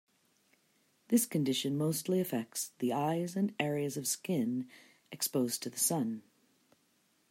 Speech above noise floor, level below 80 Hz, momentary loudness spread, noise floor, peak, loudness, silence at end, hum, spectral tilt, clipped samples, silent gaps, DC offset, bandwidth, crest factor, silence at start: 40 dB; -80 dBFS; 8 LU; -73 dBFS; -16 dBFS; -33 LUFS; 1.1 s; none; -4.5 dB/octave; under 0.1%; none; under 0.1%; 16 kHz; 20 dB; 1.1 s